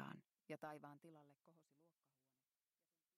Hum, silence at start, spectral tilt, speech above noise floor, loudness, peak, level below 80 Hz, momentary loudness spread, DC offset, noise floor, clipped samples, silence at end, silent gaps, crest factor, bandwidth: none; 0 s; -6.5 dB/octave; over 28 dB; -58 LUFS; -38 dBFS; under -90 dBFS; 12 LU; under 0.1%; under -90 dBFS; under 0.1%; 1.25 s; none; 22 dB; 13.5 kHz